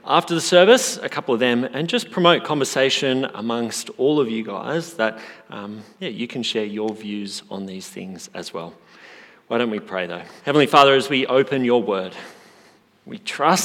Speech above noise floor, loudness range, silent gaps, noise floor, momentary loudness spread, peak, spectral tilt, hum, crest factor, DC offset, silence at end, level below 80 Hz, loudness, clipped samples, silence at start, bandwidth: 33 dB; 11 LU; none; -53 dBFS; 19 LU; 0 dBFS; -4 dB/octave; none; 20 dB; under 0.1%; 0 s; -74 dBFS; -20 LUFS; under 0.1%; 0.05 s; 17 kHz